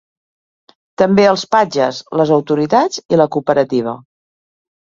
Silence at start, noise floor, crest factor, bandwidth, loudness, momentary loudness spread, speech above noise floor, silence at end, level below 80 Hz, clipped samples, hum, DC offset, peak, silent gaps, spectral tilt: 1 s; under -90 dBFS; 16 dB; 7.6 kHz; -14 LUFS; 6 LU; over 76 dB; 0.9 s; -56 dBFS; under 0.1%; none; under 0.1%; 0 dBFS; 3.05-3.09 s; -5.5 dB/octave